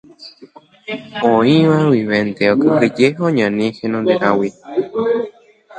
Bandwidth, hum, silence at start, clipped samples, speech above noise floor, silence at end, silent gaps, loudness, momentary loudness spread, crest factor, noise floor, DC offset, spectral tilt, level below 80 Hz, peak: 9.2 kHz; none; 0.2 s; under 0.1%; 27 dB; 0 s; none; -15 LUFS; 12 LU; 16 dB; -41 dBFS; under 0.1%; -7 dB/octave; -58 dBFS; 0 dBFS